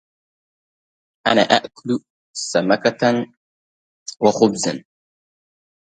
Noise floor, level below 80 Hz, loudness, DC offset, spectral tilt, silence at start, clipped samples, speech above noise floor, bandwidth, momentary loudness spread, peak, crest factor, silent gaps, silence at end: under -90 dBFS; -64 dBFS; -19 LUFS; under 0.1%; -4 dB/octave; 1.25 s; under 0.1%; over 72 dB; 9.4 kHz; 17 LU; 0 dBFS; 22 dB; 2.10-2.34 s, 3.37-4.06 s; 1.05 s